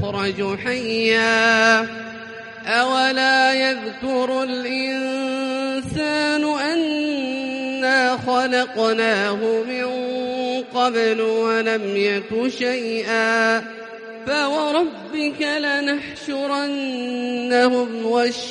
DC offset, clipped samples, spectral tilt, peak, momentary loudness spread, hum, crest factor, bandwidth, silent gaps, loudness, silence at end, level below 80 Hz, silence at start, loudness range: under 0.1%; under 0.1%; -3.5 dB/octave; -2 dBFS; 9 LU; none; 18 dB; 11 kHz; none; -20 LUFS; 0 s; -60 dBFS; 0 s; 4 LU